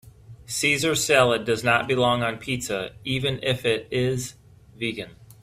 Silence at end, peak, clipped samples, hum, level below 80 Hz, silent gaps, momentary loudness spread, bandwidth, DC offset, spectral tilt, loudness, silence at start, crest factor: 0.15 s; -4 dBFS; under 0.1%; none; -52 dBFS; none; 12 LU; 16 kHz; under 0.1%; -3.5 dB/octave; -23 LUFS; 0.05 s; 20 dB